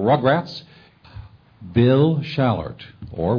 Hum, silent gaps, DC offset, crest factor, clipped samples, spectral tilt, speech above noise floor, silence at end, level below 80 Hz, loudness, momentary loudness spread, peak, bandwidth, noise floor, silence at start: none; none; under 0.1%; 18 dB; under 0.1%; -9 dB/octave; 22 dB; 0 s; -46 dBFS; -19 LUFS; 19 LU; -4 dBFS; 5.4 kHz; -41 dBFS; 0 s